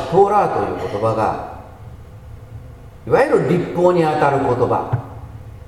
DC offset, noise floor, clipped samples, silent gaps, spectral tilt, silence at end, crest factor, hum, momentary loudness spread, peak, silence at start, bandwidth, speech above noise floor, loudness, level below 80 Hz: under 0.1%; -37 dBFS; under 0.1%; none; -7.5 dB/octave; 0.05 s; 18 dB; none; 23 LU; 0 dBFS; 0 s; 13.5 kHz; 21 dB; -17 LUFS; -42 dBFS